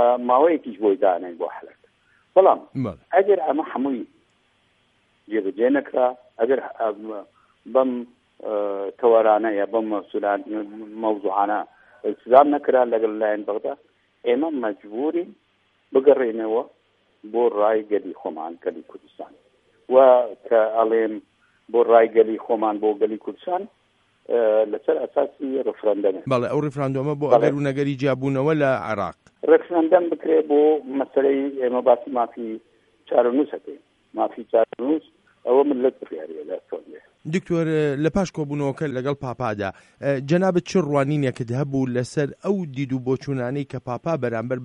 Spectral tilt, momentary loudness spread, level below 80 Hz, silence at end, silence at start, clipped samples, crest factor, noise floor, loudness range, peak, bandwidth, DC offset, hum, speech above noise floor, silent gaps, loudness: -7.5 dB/octave; 14 LU; -60 dBFS; 0 s; 0 s; under 0.1%; 20 dB; -64 dBFS; 5 LU; 0 dBFS; 9.6 kHz; under 0.1%; none; 43 dB; none; -22 LUFS